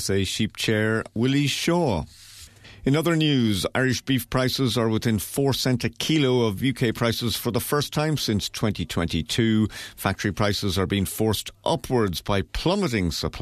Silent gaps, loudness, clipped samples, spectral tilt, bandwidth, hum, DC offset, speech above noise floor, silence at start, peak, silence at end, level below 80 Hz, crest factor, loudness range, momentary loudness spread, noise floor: none; -24 LUFS; under 0.1%; -5 dB/octave; 14 kHz; none; under 0.1%; 22 dB; 0 s; -6 dBFS; 0 s; -44 dBFS; 16 dB; 2 LU; 5 LU; -46 dBFS